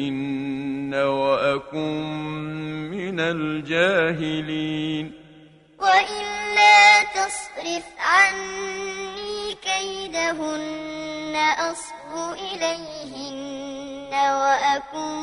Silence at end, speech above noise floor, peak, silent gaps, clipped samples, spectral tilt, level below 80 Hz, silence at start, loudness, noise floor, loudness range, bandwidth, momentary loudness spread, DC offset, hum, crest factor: 0 s; 25 dB; -4 dBFS; none; under 0.1%; -3 dB/octave; -58 dBFS; 0 s; -21 LUFS; -50 dBFS; 9 LU; 11 kHz; 15 LU; under 0.1%; none; 20 dB